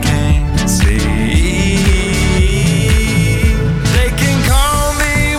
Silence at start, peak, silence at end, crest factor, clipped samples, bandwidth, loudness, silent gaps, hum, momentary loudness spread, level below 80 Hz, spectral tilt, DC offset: 0 s; 0 dBFS; 0 s; 10 dB; under 0.1%; 16.5 kHz; -13 LUFS; none; none; 2 LU; -16 dBFS; -5 dB/octave; under 0.1%